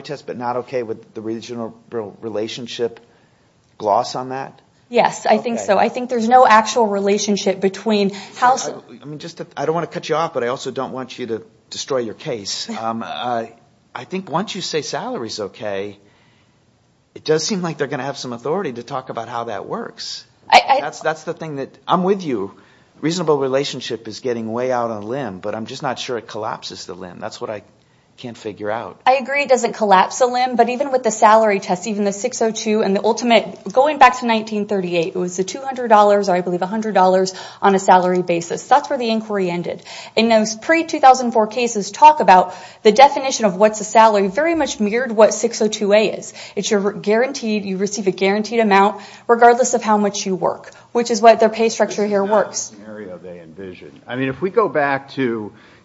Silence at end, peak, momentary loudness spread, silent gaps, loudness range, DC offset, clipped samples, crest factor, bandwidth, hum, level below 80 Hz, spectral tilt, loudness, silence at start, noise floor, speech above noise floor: 0.35 s; 0 dBFS; 17 LU; none; 10 LU; under 0.1%; under 0.1%; 18 dB; 8 kHz; none; -62 dBFS; -4 dB/octave; -17 LUFS; 0 s; -58 dBFS; 40 dB